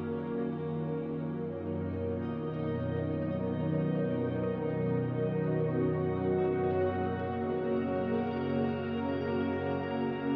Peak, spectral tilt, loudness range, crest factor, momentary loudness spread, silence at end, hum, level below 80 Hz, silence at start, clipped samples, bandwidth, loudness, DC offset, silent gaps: -20 dBFS; -11 dB/octave; 3 LU; 12 dB; 5 LU; 0 s; none; -64 dBFS; 0 s; under 0.1%; 5.2 kHz; -33 LUFS; under 0.1%; none